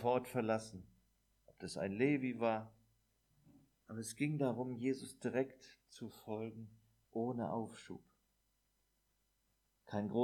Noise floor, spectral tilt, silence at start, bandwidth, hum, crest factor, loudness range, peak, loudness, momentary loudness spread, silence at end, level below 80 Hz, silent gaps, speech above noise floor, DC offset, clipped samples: -81 dBFS; -6.5 dB/octave; 0 s; 18.5 kHz; none; 20 dB; 6 LU; -22 dBFS; -40 LUFS; 18 LU; 0 s; -78 dBFS; none; 41 dB; under 0.1%; under 0.1%